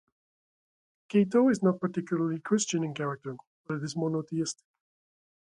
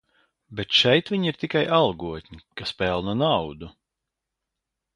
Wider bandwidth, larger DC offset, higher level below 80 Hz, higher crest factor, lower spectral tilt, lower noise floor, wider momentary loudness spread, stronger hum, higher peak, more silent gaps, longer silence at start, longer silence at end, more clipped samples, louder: about the same, 11 kHz vs 11 kHz; neither; second, -76 dBFS vs -52 dBFS; about the same, 18 dB vs 22 dB; about the same, -5.5 dB/octave vs -5.5 dB/octave; first, under -90 dBFS vs -84 dBFS; second, 14 LU vs 19 LU; neither; second, -12 dBFS vs -4 dBFS; first, 3.47-3.64 s vs none; first, 1.1 s vs 0.5 s; second, 1.05 s vs 1.25 s; neither; second, -29 LUFS vs -22 LUFS